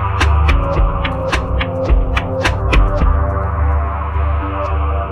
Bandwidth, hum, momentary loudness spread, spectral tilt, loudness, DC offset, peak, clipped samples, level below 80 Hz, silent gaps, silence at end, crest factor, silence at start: 9.6 kHz; none; 5 LU; -6.5 dB/octave; -17 LUFS; under 0.1%; -2 dBFS; under 0.1%; -16 dBFS; none; 0 s; 14 dB; 0 s